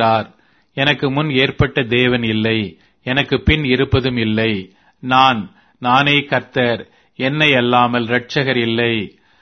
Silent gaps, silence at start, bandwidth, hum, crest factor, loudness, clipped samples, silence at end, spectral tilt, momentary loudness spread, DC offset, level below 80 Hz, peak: none; 0 s; 6.6 kHz; none; 16 dB; -16 LUFS; under 0.1%; 0.35 s; -6.5 dB/octave; 12 LU; under 0.1%; -36 dBFS; 0 dBFS